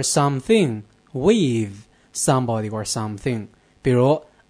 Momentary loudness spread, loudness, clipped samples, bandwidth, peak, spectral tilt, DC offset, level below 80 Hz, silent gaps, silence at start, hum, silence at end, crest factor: 12 LU; -21 LUFS; under 0.1%; 11 kHz; -4 dBFS; -5 dB/octave; under 0.1%; -52 dBFS; none; 0 s; none; 0.3 s; 16 dB